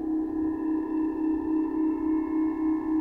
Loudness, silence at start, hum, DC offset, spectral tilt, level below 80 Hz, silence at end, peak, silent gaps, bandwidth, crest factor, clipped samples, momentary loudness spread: -28 LUFS; 0 s; none; under 0.1%; -9.5 dB/octave; -52 dBFS; 0 s; -18 dBFS; none; 2.9 kHz; 8 dB; under 0.1%; 2 LU